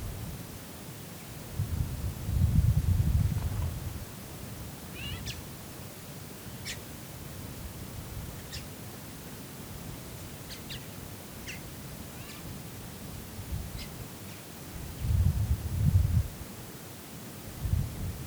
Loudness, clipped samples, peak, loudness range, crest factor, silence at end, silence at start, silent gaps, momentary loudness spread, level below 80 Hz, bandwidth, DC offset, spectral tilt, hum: -35 LUFS; under 0.1%; -14 dBFS; 10 LU; 20 dB; 0 s; 0 s; none; 15 LU; -40 dBFS; over 20 kHz; under 0.1%; -5.5 dB/octave; none